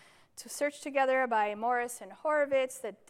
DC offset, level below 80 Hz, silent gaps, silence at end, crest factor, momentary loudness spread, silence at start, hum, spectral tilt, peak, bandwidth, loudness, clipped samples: under 0.1%; -82 dBFS; none; 0.15 s; 16 dB; 12 LU; 0.35 s; none; -2.5 dB/octave; -16 dBFS; 16 kHz; -31 LUFS; under 0.1%